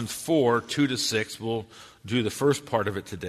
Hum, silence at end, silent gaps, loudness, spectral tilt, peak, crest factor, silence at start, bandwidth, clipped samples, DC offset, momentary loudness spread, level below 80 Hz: none; 0 s; none; -26 LUFS; -4.5 dB/octave; -10 dBFS; 16 dB; 0 s; 13.5 kHz; under 0.1%; under 0.1%; 9 LU; -60 dBFS